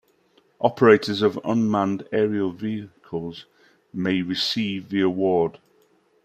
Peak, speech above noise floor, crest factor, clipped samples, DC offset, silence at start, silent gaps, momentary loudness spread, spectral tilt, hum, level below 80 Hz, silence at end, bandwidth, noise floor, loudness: -2 dBFS; 40 dB; 20 dB; under 0.1%; under 0.1%; 0.6 s; none; 15 LU; -6 dB/octave; none; -64 dBFS; 0.75 s; 14 kHz; -61 dBFS; -23 LUFS